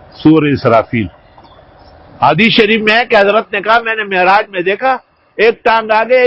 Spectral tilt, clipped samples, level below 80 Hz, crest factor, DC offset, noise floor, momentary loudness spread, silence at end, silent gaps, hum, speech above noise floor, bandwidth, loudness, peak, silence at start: -7 dB/octave; 0.3%; -44 dBFS; 12 dB; under 0.1%; -41 dBFS; 7 LU; 0 s; none; none; 30 dB; 8 kHz; -11 LUFS; 0 dBFS; 0.2 s